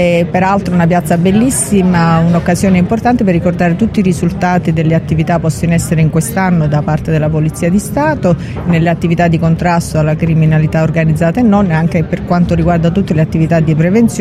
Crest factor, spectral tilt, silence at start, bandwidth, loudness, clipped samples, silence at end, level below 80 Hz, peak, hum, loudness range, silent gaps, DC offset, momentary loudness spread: 10 dB; -7 dB/octave; 0 s; 14.5 kHz; -11 LUFS; under 0.1%; 0 s; -30 dBFS; 0 dBFS; none; 2 LU; none; under 0.1%; 4 LU